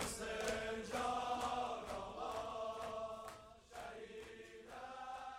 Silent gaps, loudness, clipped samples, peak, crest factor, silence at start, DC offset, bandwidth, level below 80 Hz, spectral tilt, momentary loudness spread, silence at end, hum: none; -45 LUFS; under 0.1%; -24 dBFS; 20 dB; 0 s; under 0.1%; 16 kHz; -64 dBFS; -3 dB/octave; 14 LU; 0 s; none